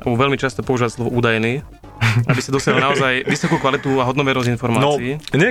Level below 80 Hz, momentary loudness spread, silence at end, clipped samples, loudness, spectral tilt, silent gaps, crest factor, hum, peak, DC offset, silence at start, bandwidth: -44 dBFS; 5 LU; 0 s; under 0.1%; -18 LUFS; -5.5 dB/octave; none; 16 dB; none; 0 dBFS; under 0.1%; 0 s; 15 kHz